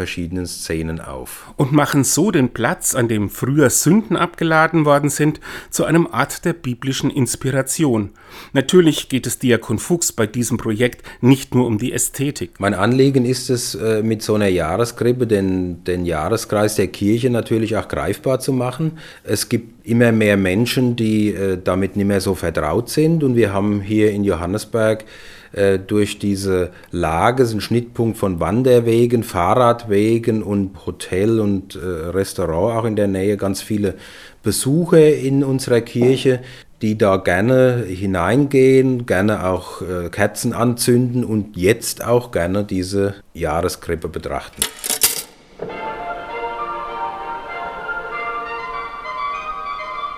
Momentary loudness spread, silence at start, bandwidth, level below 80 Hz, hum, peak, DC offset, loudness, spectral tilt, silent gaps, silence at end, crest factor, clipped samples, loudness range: 12 LU; 0 s; 18.5 kHz; -46 dBFS; none; 0 dBFS; under 0.1%; -18 LUFS; -5.5 dB/octave; none; 0 s; 18 dB; under 0.1%; 5 LU